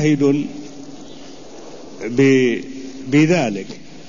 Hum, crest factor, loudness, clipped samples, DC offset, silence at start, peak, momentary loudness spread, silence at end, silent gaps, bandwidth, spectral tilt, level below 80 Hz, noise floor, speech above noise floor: none; 16 dB; -17 LUFS; under 0.1%; 1%; 0 s; -4 dBFS; 23 LU; 0.05 s; none; 7.4 kHz; -6.5 dB/octave; -56 dBFS; -38 dBFS; 22 dB